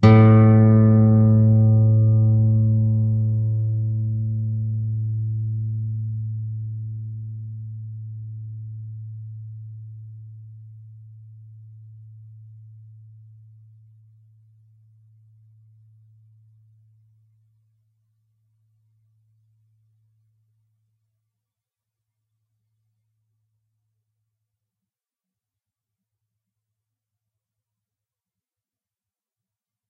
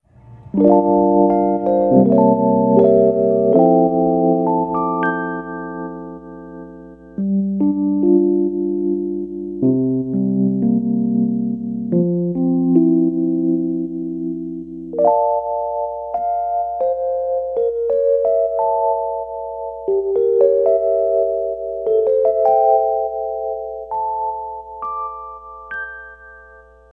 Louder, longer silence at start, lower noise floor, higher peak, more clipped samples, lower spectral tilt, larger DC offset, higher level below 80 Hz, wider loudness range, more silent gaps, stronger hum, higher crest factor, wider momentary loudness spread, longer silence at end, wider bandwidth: about the same, -19 LUFS vs -17 LUFS; second, 0 s vs 0.25 s; first, under -90 dBFS vs -44 dBFS; about the same, -2 dBFS vs -2 dBFS; neither; second, -11 dB/octave vs -12.5 dB/octave; neither; about the same, -52 dBFS vs -50 dBFS; first, 27 LU vs 7 LU; neither; neither; about the same, 20 dB vs 16 dB; first, 23 LU vs 14 LU; first, 19 s vs 0.5 s; first, 4.7 kHz vs 3.4 kHz